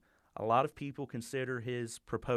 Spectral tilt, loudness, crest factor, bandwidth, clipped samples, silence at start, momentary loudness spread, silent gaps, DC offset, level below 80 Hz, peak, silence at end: -5.5 dB/octave; -36 LUFS; 20 dB; 14.5 kHz; under 0.1%; 0.35 s; 11 LU; none; under 0.1%; -64 dBFS; -16 dBFS; 0 s